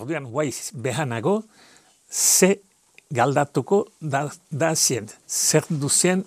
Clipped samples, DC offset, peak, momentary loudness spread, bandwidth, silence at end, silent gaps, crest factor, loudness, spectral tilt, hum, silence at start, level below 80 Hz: under 0.1%; under 0.1%; -2 dBFS; 11 LU; 15.5 kHz; 0.05 s; none; 22 dB; -22 LUFS; -3.5 dB/octave; none; 0 s; -72 dBFS